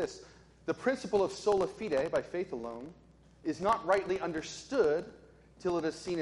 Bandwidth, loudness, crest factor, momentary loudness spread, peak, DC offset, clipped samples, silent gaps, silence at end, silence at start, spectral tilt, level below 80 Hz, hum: 11.5 kHz; -33 LUFS; 18 dB; 13 LU; -16 dBFS; under 0.1%; under 0.1%; none; 0 s; 0 s; -5 dB/octave; -62 dBFS; none